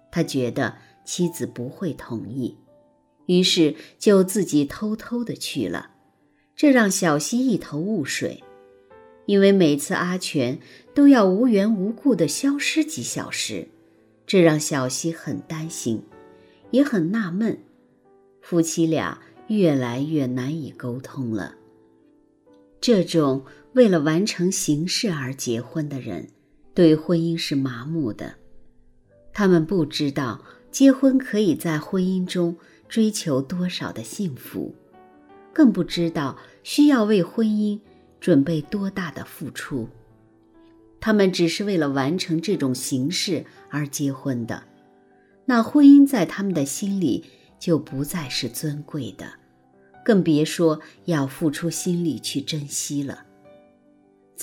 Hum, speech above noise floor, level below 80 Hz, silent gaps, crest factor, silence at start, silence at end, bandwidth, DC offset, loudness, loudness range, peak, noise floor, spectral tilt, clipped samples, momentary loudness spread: none; 41 dB; -58 dBFS; none; 20 dB; 0.15 s; 0 s; 17 kHz; under 0.1%; -22 LUFS; 7 LU; -2 dBFS; -62 dBFS; -5 dB/octave; under 0.1%; 14 LU